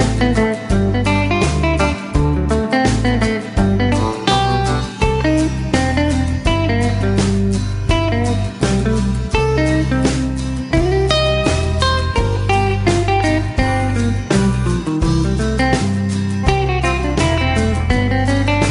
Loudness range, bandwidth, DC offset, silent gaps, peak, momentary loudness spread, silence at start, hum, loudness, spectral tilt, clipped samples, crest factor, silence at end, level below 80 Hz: 1 LU; 11 kHz; under 0.1%; none; 0 dBFS; 3 LU; 0 s; none; -16 LUFS; -6 dB/octave; under 0.1%; 14 dB; 0 s; -24 dBFS